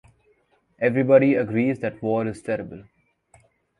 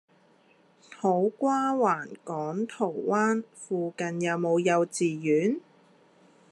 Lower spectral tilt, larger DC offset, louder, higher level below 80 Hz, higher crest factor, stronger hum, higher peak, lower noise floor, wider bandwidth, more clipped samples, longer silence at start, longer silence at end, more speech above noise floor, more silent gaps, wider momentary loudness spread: first, -8.5 dB/octave vs -6 dB/octave; neither; first, -22 LUFS vs -27 LUFS; first, -60 dBFS vs -82 dBFS; about the same, 20 dB vs 18 dB; neither; first, -4 dBFS vs -10 dBFS; about the same, -64 dBFS vs -62 dBFS; about the same, 11 kHz vs 11.5 kHz; neither; about the same, 0.8 s vs 0.9 s; about the same, 1 s vs 0.95 s; first, 43 dB vs 35 dB; neither; first, 12 LU vs 8 LU